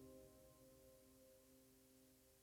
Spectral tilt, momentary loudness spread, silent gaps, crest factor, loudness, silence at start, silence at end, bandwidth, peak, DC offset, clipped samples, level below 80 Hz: -4.5 dB/octave; 4 LU; none; 16 dB; -68 LUFS; 0 s; 0 s; 19.5 kHz; -52 dBFS; under 0.1%; under 0.1%; -80 dBFS